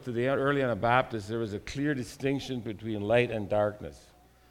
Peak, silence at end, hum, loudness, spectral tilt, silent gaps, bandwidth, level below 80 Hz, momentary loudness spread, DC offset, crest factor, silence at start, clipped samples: -10 dBFS; 0.5 s; none; -30 LUFS; -6.5 dB/octave; none; 16 kHz; -56 dBFS; 10 LU; under 0.1%; 20 dB; 0 s; under 0.1%